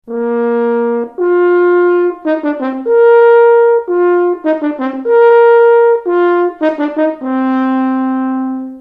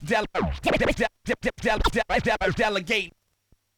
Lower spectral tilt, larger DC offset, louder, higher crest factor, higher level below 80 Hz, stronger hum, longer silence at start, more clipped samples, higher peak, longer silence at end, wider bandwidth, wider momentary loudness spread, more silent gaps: first, -7.5 dB/octave vs -4.5 dB/octave; neither; first, -11 LUFS vs -25 LUFS; second, 10 dB vs 18 dB; second, -60 dBFS vs -36 dBFS; neither; about the same, 0.05 s vs 0 s; neither; first, 0 dBFS vs -6 dBFS; second, 0 s vs 0.7 s; second, 4.5 kHz vs 19 kHz; first, 10 LU vs 5 LU; neither